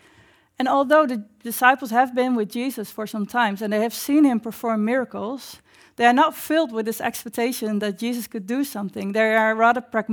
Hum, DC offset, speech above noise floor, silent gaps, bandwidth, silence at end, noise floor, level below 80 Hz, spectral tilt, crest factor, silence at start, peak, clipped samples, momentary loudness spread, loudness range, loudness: none; under 0.1%; 34 dB; none; over 20 kHz; 0 s; -55 dBFS; -70 dBFS; -4.5 dB/octave; 20 dB; 0.6 s; -2 dBFS; under 0.1%; 12 LU; 2 LU; -22 LUFS